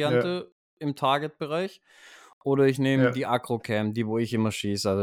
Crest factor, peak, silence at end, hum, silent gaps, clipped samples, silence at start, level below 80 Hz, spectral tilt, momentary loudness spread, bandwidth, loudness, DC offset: 16 dB; -10 dBFS; 0 s; none; 0.52-0.77 s, 2.33-2.41 s; under 0.1%; 0 s; -70 dBFS; -6 dB/octave; 11 LU; 16 kHz; -26 LUFS; under 0.1%